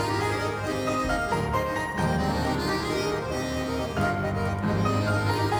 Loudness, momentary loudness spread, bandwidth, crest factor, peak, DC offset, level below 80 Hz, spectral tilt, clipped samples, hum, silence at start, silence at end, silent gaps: -27 LUFS; 4 LU; over 20 kHz; 14 dB; -12 dBFS; under 0.1%; -40 dBFS; -6 dB/octave; under 0.1%; none; 0 s; 0 s; none